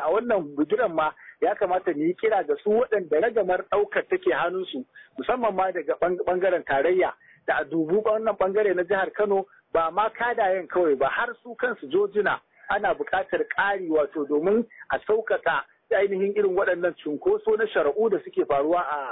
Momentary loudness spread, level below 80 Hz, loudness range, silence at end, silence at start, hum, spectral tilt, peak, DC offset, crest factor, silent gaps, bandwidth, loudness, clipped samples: 5 LU; -60 dBFS; 1 LU; 0 s; 0 s; none; -9.5 dB/octave; -12 dBFS; under 0.1%; 12 dB; none; 4 kHz; -25 LUFS; under 0.1%